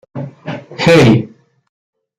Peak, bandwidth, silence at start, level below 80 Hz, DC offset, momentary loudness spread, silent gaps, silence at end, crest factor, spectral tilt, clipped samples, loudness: 0 dBFS; 14 kHz; 0.15 s; -46 dBFS; under 0.1%; 20 LU; none; 0.95 s; 14 dB; -6.5 dB/octave; under 0.1%; -10 LUFS